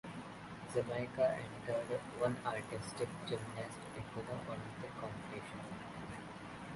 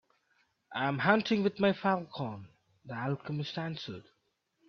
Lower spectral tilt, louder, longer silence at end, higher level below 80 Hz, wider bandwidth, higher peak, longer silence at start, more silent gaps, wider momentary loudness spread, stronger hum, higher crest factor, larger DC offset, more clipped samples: second, -5.5 dB/octave vs -7 dB/octave; second, -42 LUFS vs -32 LUFS; second, 0 s vs 0.7 s; first, -66 dBFS vs -72 dBFS; first, 11.5 kHz vs 6.6 kHz; second, -22 dBFS vs -10 dBFS; second, 0.05 s vs 0.7 s; neither; second, 12 LU vs 16 LU; neither; about the same, 20 dB vs 24 dB; neither; neither